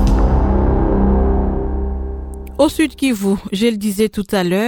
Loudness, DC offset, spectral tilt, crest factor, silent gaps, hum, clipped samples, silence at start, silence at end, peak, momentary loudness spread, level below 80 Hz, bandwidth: -17 LUFS; under 0.1%; -6.5 dB/octave; 14 dB; none; none; under 0.1%; 0 s; 0 s; 0 dBFS; 9 LU; -20 dBFS; 18 kHz